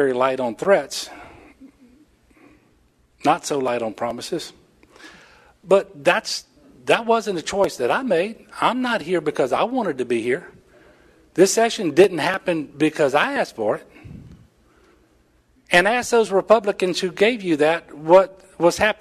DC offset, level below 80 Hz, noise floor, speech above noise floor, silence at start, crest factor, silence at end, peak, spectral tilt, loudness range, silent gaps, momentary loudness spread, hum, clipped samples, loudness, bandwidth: under 0.1%; -58 dBFS; -59 dBFS; 40 dB; 0 s; 20 dB; 0.1 s; -2 dBFS; -4 dB/octave; 8 LU; none; 11 LU; none; under 0.1%; -20 LUFS; 13.5 kHz